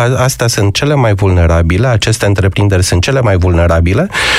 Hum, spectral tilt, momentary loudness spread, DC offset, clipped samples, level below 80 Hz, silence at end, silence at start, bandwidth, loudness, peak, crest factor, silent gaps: none; -5 dB/octave; 2 LU; under 0.1%; under 0.1%; -22 dBFS; 0 s; 0 s; 15 kHz; -10 LUFS; 0 dBFS; 8 dB; none